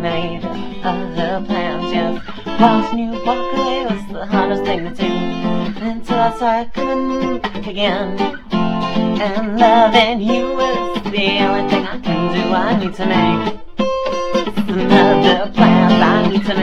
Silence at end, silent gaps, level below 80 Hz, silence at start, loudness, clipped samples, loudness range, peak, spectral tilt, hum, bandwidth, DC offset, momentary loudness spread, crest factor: 0 s; none; -38 dBFS; 0 s; -16 LUFS; under 0.1%; 4 LU; 0 dBFS; -6.5 dB/octave; none; 8.4 kHz; under 0.1%; 10 LU; 16 dB